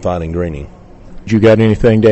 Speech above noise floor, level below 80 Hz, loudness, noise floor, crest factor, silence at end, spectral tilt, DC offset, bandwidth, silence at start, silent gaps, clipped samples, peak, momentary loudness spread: 21 dB; -30 dBFS; -12 LUFS; -32 dBFS; 12 dB; 0 s; -8 dB/octave; under 0.1%; 8.4 kHz; 0 s; none; under 0.1%; -2 dBFS; 17 LU